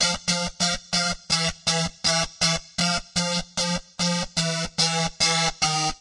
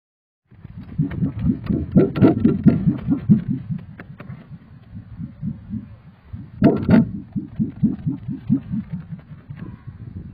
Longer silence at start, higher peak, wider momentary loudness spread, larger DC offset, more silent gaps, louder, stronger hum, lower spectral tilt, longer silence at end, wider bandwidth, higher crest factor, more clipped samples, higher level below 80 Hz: second, 0 s vs 0.7 s; second, -8 dBFS vs 0 dBFS; second, 4 LU vs 23 LU; neither; neither; second, -23 LUFS vs -20 LUFS; neither; second, -2.5 dB/octave vs -12.5 dB/octave; about the same, 0.05 s vs 0 s; first, 11.5 kHz vs 5 kHz; about the same, 16 dB vs 20 dB; neither; about the same, -46 dBFS vs -42 dBFS